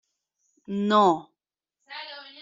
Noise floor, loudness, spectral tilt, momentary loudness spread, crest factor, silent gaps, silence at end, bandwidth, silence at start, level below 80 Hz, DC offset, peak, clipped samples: -85 dBFS; -23 LUFS; -4 dB/octave; 20 LU; 18 dB; none; 0.2 s; 7.6 kHz; 0.7 s; -72 dBFS; under 0.1%; -8 dBFS; under 0.1%